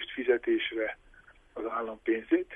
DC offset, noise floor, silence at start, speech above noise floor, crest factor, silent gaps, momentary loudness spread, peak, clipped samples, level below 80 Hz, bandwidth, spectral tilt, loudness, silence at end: under 0.1%; -58 dBFS; 0 s; 27 dB; 18 dB; none; 13 LU; -14 dBFS; under 0.1%; -62 dBFS; 3.8 kHz; -6 dB/octave; -31 LUFS; 0 s